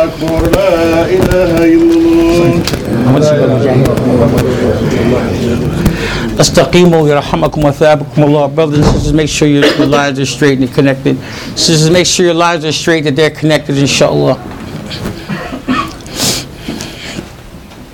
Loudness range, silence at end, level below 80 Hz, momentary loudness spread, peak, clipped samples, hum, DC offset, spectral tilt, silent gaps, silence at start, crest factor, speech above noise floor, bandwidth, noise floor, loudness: 4 LU; 0 s; -28 dBFS; 13 LU; 0 dBFS; under 0.1%; none; under 0.1%; -5 dB/octave; none; 0 s; 10 dB; 21 dB; 18.5 kHz; -30 dBFS; -10 LUFS